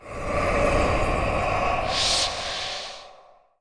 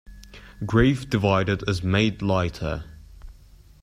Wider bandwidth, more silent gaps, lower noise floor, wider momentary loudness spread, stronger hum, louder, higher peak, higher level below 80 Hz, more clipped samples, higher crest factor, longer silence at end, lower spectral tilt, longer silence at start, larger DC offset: second, 10.5 kHz vs 14 kHz; neither; about the same, -53 dBFS vs -50 dBFS; about the same, 10 LU vs 12 LU; neither; about the same, -24 LUFS vs -23 LUFS; second, -8 dBFS vs -4 dBFS; first, -34 dBFS vs -40 dBFS; neither; about the same, 16 dB vs 20 dB; about the same, 0.45 s vs 0.5 s; second, -3.5 dB/octave vs -6.5 dB/octave; about the same, 0 s vs 0.1 s; first, 0.2% vs under 0.1%